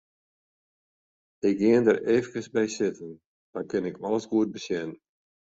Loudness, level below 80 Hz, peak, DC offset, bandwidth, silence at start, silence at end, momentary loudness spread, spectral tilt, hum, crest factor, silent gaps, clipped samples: -26 LUFS; -68 dBFS; -8 dBFS; under 0.1%; 8 kHz; 1.45 s; 0.55 s; 17 LU; -6 dB/octave; none; 20 dB; 3.26-3.53 s; under 0.1%